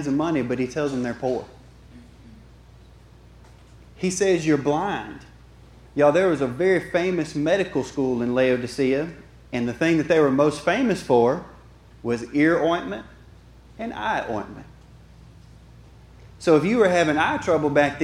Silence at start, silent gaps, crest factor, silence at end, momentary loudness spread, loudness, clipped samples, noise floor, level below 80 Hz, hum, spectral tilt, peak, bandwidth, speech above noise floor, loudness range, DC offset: 0 s; none; 18 dB; 0 s; 13 LU; -22 LUFS; under 0.1%; -48 dBFS; -50 dBFS; none; -5.5 dB/octave; -4 dBFS; 12.5 kHz; 27 dB; 10 LU; under 0.1%